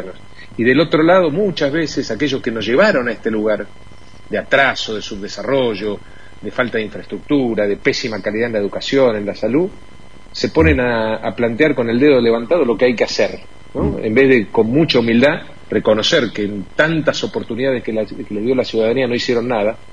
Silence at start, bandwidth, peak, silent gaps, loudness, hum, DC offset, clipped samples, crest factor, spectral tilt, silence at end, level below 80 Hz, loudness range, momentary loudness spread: 0 s; 10 kHz; 0 dBFS; none; -16 LUFS; none; 2%; under 0.1%; 16 dB; -5.5 dB/octave; 0.15 s; -38 dBFS; 5 LU; 11 LU